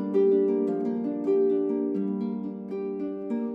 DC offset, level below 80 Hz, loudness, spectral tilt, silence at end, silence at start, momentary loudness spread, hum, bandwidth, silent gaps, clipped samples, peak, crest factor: under 0.1%; -76 dBFS; -27 LUFS; -10.5 dB/octave; 0 s; 0 s; 10 LU; none; 4.2 kHz; none; under 0.1%; -14 dBFS; 12 dB